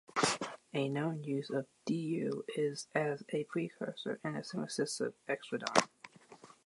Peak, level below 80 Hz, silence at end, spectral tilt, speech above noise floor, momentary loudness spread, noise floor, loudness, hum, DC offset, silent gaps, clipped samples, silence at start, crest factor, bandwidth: -8 dBFS; -82 dBFS; 0.15 s; -4.5 dB/octave; 22 dB; 8 LU; -58 dBFS; -37 LUFS; none; under 0.1%; none; under 0.1%; 0.15 s; 28 dB; 11.5 kHz